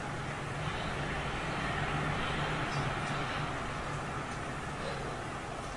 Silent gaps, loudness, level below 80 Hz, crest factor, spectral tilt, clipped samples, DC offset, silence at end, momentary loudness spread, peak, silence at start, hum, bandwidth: none; -36 LUFS; -48 dBFS; 14 dB; -5 dB/octave; under 0.1%; under 0.1%; 0 s; 5 LU; -22 dBFS; 0 s; none; 11.5 kHz